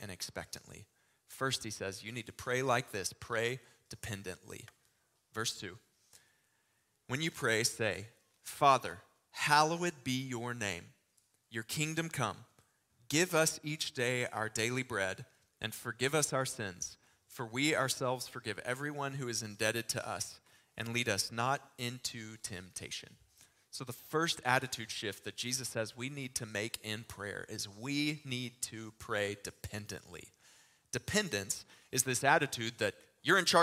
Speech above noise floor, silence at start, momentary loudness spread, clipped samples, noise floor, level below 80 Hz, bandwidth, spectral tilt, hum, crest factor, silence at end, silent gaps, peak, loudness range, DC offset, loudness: 41 dB; 0 s; 16 LU; under 0.1%; -77 dBFS; -70 dBFS; 16 kHz; -3 dB/octave; none; 26 dB; 0 s; none; -10 dBFS; 6 LU; under 0.1%; -35 LUFS